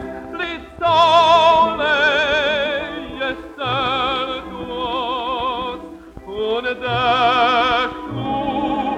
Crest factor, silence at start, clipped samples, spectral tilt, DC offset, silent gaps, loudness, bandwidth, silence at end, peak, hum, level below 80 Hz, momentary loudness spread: 16 dB; 0 s; under 0.1%; -4.5 dB/octave; under 0.1%; none; -18 LUFS; 10.5 kHz; 0 s; -2 dBFS; none; -44 dBFS; 15 LU